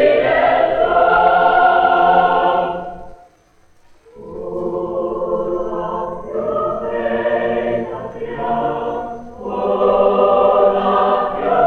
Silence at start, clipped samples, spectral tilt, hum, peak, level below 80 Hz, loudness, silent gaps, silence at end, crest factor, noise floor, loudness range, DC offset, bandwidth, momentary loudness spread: 0 s; under 0.1%; -7 dB/octave; none; 0 dBFS; -44 dBFS; -16 LUFS; none; 0 s; 16 dB; -52 dBFS; 10 LU; under 0.1%; 6.4 kHz; 14 LU